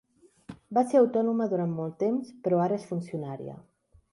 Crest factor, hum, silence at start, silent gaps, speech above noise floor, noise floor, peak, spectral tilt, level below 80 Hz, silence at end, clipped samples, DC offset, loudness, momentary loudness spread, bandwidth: 16 dB; none; 0.5 s; none; 22 dB; -49 dBFS; -12 dBFS; -8.5 dB/octave; -70 dBFS; 0.5 s; under 0.1%; under 0.1%; -28 LUFS; 15 LU; 11.5 kHz